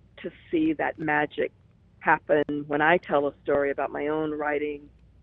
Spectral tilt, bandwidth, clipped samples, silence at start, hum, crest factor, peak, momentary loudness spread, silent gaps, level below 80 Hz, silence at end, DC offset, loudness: -9 dB/octave; 4 kHz; under 0.1%; 0.15 s; none; 20 dB; -6 dBFS; 10 LU; none; -58 dBFS; 0.35 s; under 0.1%; -26 LUFS